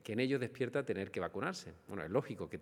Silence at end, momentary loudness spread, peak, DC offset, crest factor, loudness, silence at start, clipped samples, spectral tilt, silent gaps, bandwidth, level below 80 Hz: 0 s; 10 LU; -20 dBFS; under 0.1%; 18 dB; -39 LUFS; 0.05 s; under 0.1%; -6 dB/octave; none; 16 kHz; -72 dBFS